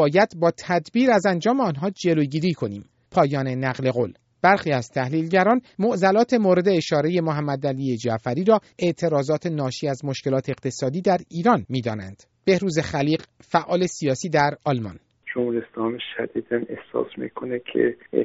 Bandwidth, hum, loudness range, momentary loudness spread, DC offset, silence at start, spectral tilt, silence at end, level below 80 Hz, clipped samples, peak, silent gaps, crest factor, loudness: 8 kHz; none; 4 LU; 10 LU; under 0.1%; 0 s; -5.5 dB/octave; 0 s; -62 dBFS; under 0.1%; -2 dBFS; none; 20 dB; -23 LUFS